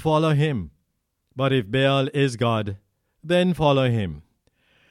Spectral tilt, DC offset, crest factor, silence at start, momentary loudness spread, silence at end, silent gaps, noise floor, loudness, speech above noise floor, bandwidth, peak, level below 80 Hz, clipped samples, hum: -7 dB/octave; under 0.1%; 16 dB; 0 s; 17 LU; 0.7 s; none; -74 dBFS; -22 LUFS; 53 dB; 12 kHz; -6 dBFS; -50 dBFS; under 0.1%; none